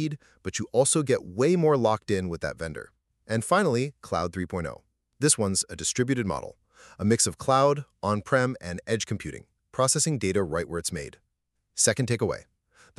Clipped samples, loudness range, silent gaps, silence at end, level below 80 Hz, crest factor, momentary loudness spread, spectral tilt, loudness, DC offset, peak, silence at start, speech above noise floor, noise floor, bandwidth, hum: under 0.1%; 3 LU; none; 0.55 s; -54 dBFS; 22 dB; 14 LU; -4 dB/octave; -26 LUFS; under 0.1%; -4 dBFS; 0 s; 52 dB; -78 dBFS; 13.5 kHz; none